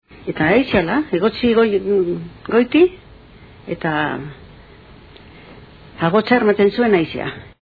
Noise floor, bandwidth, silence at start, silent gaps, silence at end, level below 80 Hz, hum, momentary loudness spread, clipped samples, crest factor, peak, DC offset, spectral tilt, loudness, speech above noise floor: -43 dBFS; 4.9 kHz; 0.15 s; none; 0.15 s; -46 dBFS; none; 14 LU; under 0.1%; 18 dB; 0 dBFS; under 0.1%; -9 dB/octave; -17 LUFS; 26 dB